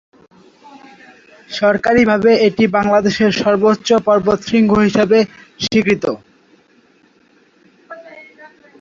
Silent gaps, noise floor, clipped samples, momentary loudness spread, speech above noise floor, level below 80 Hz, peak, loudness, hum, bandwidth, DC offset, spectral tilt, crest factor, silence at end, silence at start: none; -53 dBFS; under 0.1%; 11 LU; 40 dB; -48 dBFS; 0 dBFS; -14 LUFS; none; 7.4 kHz; under 0.1%; -5.5 dB/octave; 16 dB; 0.6 s; 0.75 s